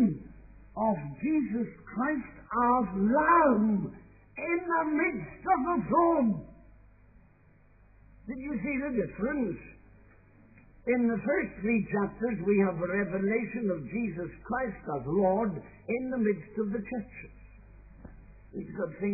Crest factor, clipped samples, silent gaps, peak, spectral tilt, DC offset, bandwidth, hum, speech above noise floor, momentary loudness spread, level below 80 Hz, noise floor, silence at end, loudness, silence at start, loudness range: 20 dB; under 0.1%; none; -12 dBFS; -13.5 dB/octave; under 0.1%; 2.7 kHz; none; 31 dB; 15 LU; -54 dBFS; -60 dBFS; 0 s; -30 LUFS; 0 s; 9 LU